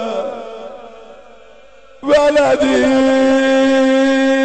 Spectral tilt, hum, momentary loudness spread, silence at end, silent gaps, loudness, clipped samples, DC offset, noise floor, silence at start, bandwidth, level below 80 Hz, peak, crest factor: -4 dB/octave; none; 17 LU; 0 s; none; -13 LUFS; under 0.1%; 0.6%; -44 dBFS; 0 s; 9 kHz; -46 dBFS; -4 dBFS; 10 dB